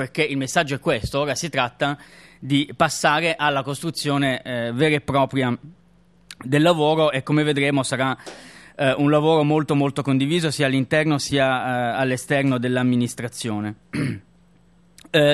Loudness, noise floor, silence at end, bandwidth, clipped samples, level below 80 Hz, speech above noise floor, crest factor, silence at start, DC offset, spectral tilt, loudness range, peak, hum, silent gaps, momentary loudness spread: -21 LUFS; -56 dBFS; 0 s; 13 kHz; under 0.1%; -54 dBFS; 35 dB; 18 dB; 0 s; under 0.1%; -5 dB/octave; 3 LU; -2 dBFS; none; none; 9 LU